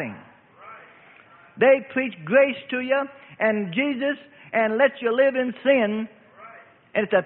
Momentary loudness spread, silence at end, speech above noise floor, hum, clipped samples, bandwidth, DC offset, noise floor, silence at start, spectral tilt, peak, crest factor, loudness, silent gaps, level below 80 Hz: 10 LU; 0 s; 29 dB; none; under 0.1%; 4.1 kHz; under 0.1%; -51 dBFS; 0 s; -10 dB/octave; -6 dBFS; 18 dB; -22 LUFS; none; -70 dBFS